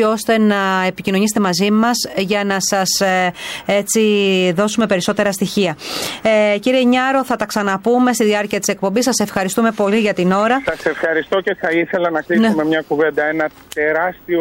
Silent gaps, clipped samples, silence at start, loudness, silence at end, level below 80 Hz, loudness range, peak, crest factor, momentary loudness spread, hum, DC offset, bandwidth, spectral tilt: none; under 0.1%; 0 s; -16 LUFS; 0 s; -54 dBFS; 1 LU; -4 dBFS; 12 dB; 5 LU; none; under 0.1%; 16.5 kHz; -4 dB/octave